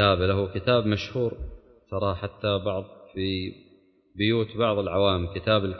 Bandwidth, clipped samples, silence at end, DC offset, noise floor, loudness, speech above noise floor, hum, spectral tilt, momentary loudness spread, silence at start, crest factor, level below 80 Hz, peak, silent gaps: 6.4 kHz; under 0.1%; 0 s; under 0.1%; -59 dBFS; -26 LUFS; 34 dB; none; -7.5 dB/octave; 12 LU; 0 s; 20 dB; -42 dBFS; -6 dBFS; none